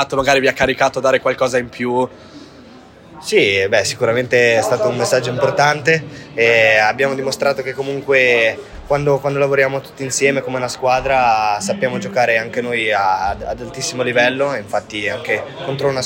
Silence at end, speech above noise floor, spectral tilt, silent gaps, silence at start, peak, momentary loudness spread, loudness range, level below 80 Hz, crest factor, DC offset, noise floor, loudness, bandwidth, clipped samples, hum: 0 s; 25 dB; -4 dB/octave; none; 0 s; 0 dBFS; 9 LU; 3 LU; -46 dBFS; 16 dB; under 0.1%; -41 dBFS; -16 LUFS; 16.5 kHz; under 0.1%; none